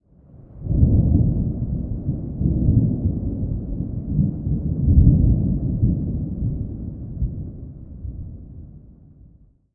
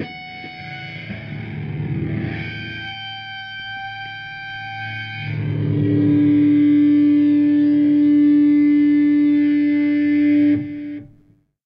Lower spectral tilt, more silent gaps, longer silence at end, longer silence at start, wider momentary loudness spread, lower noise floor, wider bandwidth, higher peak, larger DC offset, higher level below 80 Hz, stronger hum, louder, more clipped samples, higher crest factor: first, -17 dB/octave vs -9.5 dB/octave; neither; first, 0.85 s vs 0.6 s; first, 0.35 s vs 0 s; first, 19 LU vs 16 LU; second, -51 dBFS vs -55 dBFS; second, 1.2 kHz vs 5.4 kHz; first, -2 dBFS vs -6 dBFS; neither; first, -26 dBFS vs -52 dBFS; neither; second, -21 LUFS vs -17 LUFS; neither; first, 18 dB vs 10 dB